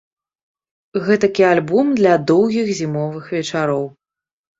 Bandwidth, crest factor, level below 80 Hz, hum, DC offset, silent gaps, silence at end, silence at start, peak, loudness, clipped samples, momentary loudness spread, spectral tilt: 7.8 kHz; 16 dB; -60 dBFS; none; under 0.1%; none; 0.7 s; 0.95 s; -2 dBFS; -17 LUFS; under 0.1%; 10 LU; -6 dB/octave